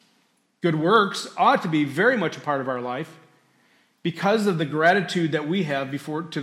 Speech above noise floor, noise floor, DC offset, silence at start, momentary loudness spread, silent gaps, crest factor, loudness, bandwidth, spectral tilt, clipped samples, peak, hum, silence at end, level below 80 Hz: 43 dB; -66 dBFS; under 0.1%; 0.65 s; 11 LU; none; 18 dB; -23 LUFS; 14.5 kHz; -5.5 dB/octave; under 0.1%; -6 dBFS; none; 0 s; -72 dBFS